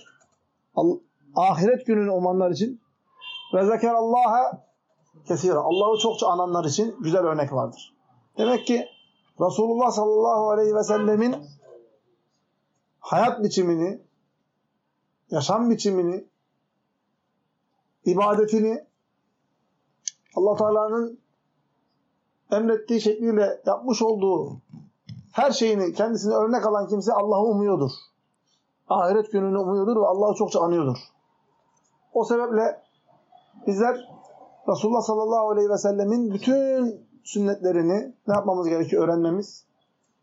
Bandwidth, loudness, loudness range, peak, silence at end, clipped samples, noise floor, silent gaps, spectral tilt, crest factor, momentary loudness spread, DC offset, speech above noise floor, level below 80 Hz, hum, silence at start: 8 kHz; -23 LUFS; 5 LU; -8 dBFS; 0.65 s; under 0.1%; -74 dBFS; none; -5.5 dB/octave; 16 dB; 10 LU; under 0.1%; 52 dB; -80 dBFS; none; 0.75 s